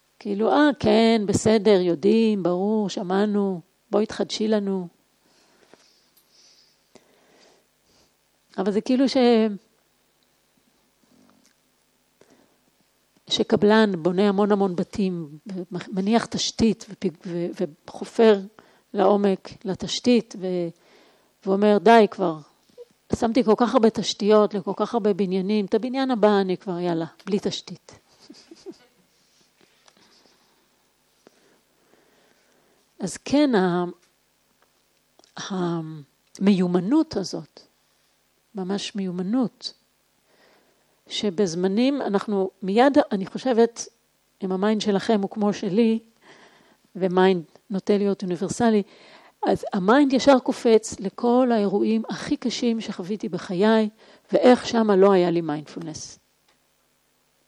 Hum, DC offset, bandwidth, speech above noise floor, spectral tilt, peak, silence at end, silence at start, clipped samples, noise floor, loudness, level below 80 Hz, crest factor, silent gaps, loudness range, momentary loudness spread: none; under 0.1%; 11 kHz; 45 dB; -5.5 dB/octave; -2 dBFS; 1.35 s; 0.25 s; under 0.1%; -66 dBFS; -22 LUFS; -60 dBFS; 22 dB; none; 8 LU; 15 LU